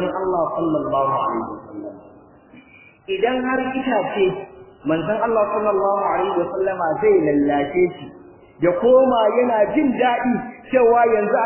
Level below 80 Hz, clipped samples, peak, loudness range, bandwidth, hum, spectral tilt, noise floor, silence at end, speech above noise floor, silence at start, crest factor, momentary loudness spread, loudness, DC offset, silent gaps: -54 dBFS; under 0.1%; -4 dBFS; 6 LU; 3.2 kHz; none; -10 dB/octave; -47 dBFS; 0 s; 29 dB; 0 s; 16 dB; 13 LU; -19 LUFS; under 0.1%; none